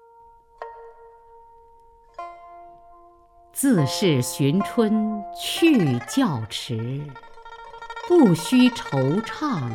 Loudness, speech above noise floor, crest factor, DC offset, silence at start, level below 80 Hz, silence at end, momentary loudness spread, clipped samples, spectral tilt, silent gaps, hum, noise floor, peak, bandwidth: -21 LUFS; 32 dB; 18 dB; under 0.1%; 0.6 s; -58 dBFS; 0 s; 22 LU; under 0.1%; -5.5 dB/octave; none; none; -52 dBFS; -6 dBFS; 17.5 kHz